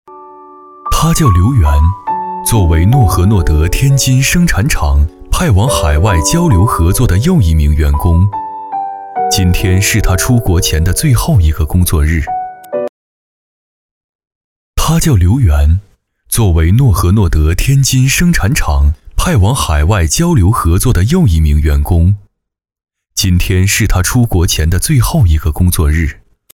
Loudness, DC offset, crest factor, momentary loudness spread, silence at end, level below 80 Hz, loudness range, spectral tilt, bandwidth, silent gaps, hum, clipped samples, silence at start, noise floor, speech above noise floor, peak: -11 LUFS; under 0.1%; 10 dB; 8 LU; 0.4 s; -18 dBFS; 4 LU; -5 dB/octave; 17.5 kHz; 12.89-14.19 s, 14.27-14.74 s; none; under 0.1%; 0.1 s; -35 dBFS; 26 dB; 0 dBFS